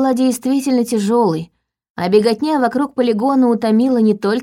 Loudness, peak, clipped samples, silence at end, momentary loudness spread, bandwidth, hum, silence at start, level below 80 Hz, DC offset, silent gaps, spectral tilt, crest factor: -15 LUFS; 0 dBFS; under 0.1%; 0 s; 5 LU; 16 kHz; none; 0 s; -60 dBFS; under 0.1%; 1.90-1.95 s; -6 dB/octave; 14 dB